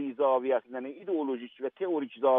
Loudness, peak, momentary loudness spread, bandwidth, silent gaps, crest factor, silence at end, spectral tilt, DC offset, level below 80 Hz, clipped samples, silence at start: -31 LUFS; -14 dBFS; 11 LU; 3.8 kHz; none; 16 dB; 0 s; -3.5 dB/octave; under 0.1%; under -90 dBFS; under 0.1%; 0 s